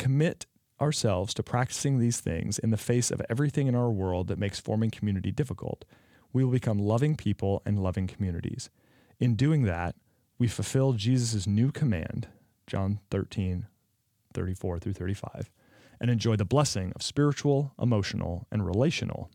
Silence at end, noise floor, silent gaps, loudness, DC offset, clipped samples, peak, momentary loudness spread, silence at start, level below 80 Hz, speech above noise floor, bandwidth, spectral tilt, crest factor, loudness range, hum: 0.05 s; -73 dBFS; none; -29 LUFS; under 0.1%; under 0.1%; -10 dBFS; 11 LU; 0 s; -56 dBFS; 45 dB; 15.5 kHz; -6 dB/octave; 18 dB; 5 LU; none